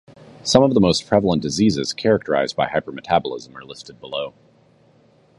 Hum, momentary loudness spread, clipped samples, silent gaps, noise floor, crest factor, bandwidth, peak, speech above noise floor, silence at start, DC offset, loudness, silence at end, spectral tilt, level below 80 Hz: none; 18 LU; under 0.1%; none; -55 dBFS; 20 dB; 11.5 kHz; 0 dBFS; 35 dB; 0.45 s; under 0.1%; -19 LUFS; 1.1 s; -5 dB/octave; -48 dBFS